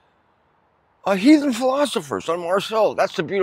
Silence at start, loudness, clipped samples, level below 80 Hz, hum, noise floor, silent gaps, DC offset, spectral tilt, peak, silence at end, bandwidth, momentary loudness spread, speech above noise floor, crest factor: 1.05 s; -20 LUFS; under 0.1%; -66 dBFS; none; -62 dBFS; none; under 0.1%; -5 dB/octave; -2 dBFS; 0 s; 16 kHz; 10 LU; 43 dB; 18 dB